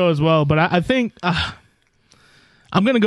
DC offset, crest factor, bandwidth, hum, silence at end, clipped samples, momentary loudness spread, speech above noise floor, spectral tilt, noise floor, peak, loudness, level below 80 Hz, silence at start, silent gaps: under 0.1%; 14 dB; 11 kHz; none; 0 s; under 0.1%; 7 LU; 42 dB; -7 dB/octave; -59 dBFS; -4 dBFS; -18 LUFS; -44 dBFS; 0 s; none